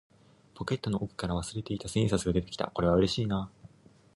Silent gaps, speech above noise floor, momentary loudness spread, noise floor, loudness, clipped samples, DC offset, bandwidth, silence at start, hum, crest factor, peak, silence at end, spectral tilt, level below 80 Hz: none; 28 dB; 10 LU; -58 dBFS; -31 LUFS; under 0.1%; under 0.1%; 11.5 kHz; 0.55 s; none; 18 dB; -12 dBFS; 0.7 s; -6 dB/octave; -48 dBFS